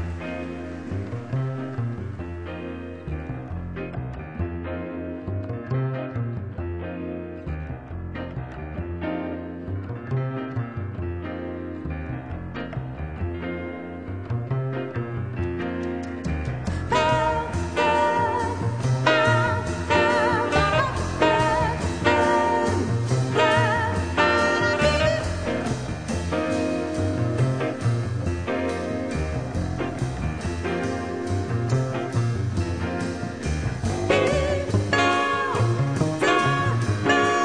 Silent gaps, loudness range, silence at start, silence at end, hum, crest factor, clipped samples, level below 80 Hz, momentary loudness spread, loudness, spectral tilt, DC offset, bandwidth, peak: none; 11 LU; 0 s; 0 s; none; 20 dB; under 0.1%; -40 dBFS; 13 LU; -25 LUFS; -6 dB/octave; 0.3%; 10 kHz; -4 dBFS